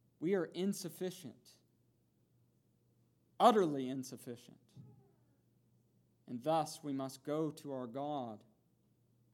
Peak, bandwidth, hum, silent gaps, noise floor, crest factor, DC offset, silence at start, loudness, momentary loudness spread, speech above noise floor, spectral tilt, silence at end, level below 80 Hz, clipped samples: -12 dBFS; 19 kHz; none; none; -75 dBFS; 28 dB; under 0.1%; 0.2 s; -37 LUFS; 20 LU; 38 dB; -5.5 dB/octave; 0.95 s; under -90 dBFS; under 0.1%